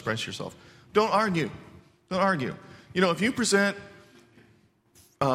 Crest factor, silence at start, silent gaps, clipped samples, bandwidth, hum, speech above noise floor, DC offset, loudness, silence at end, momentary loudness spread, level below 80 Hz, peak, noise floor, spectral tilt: 20 dB; 0 s; none; under 0.1%; 15.5 kHz; none; 36 dB; under 0.1%; -26 LUFS; 0 s; 16 LU; -62 dBFS; -8 dBFS; -62 dBFS; -4.5 dB/octave